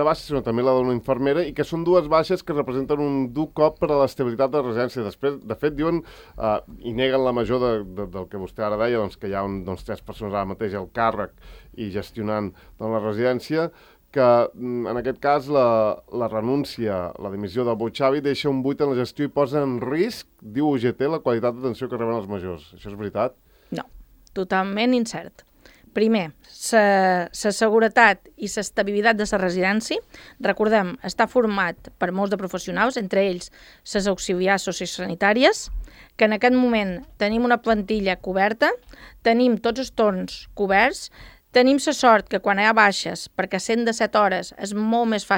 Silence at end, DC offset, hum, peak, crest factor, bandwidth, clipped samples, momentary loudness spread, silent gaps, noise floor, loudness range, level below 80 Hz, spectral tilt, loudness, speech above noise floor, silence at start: 0 s; under 0.1%; none; 0 dBFS; 22 dB; 17 kHz; under 0.1%; 13 LU; none; -48 dBFS; 7 LU; -48 dBFS; -5 dB/octave; -22 LUFS; 26 dB; 0 s